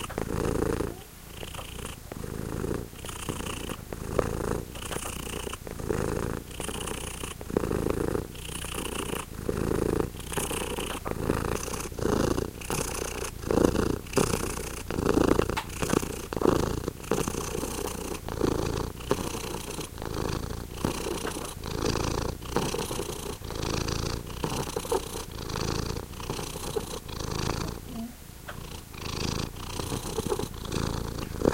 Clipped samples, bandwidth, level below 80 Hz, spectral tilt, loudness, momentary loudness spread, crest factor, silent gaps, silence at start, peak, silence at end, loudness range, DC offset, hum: under 0.1%; 17 kHz; -40 dBFS; -4.5 dB/octave; -31 LUFS; 10 LU; 26 dB; none; 0 s; -6 dBFS; 0 s; 6 LU; under 0.1%; none